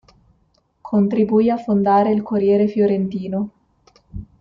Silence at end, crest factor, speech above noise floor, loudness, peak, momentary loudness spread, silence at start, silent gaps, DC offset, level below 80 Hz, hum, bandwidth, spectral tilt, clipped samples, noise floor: 0.15 s; 14 dB; 45 dB; -18 LUFS; -4 dBFS; 14 LU; 0.85 s; none; under 0.1%; -50 dBFS; none; 5.8 kHz; -10 dB/octave; under 0.1%; -62 dBFS